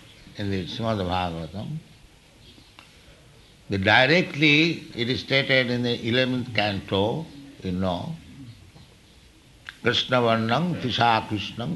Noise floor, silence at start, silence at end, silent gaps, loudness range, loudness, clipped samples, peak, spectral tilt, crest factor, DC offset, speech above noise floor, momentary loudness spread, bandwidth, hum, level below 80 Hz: -53 dBFS; 0.25 s; 0 s; none; 10 LU; -23 LUFS; under 0.1%; -4 dBFS; -5.5 dB/octave; 20 dB; under 0.1%; 29 dB; 18 LU; 12 kHz; none; -54 dBFS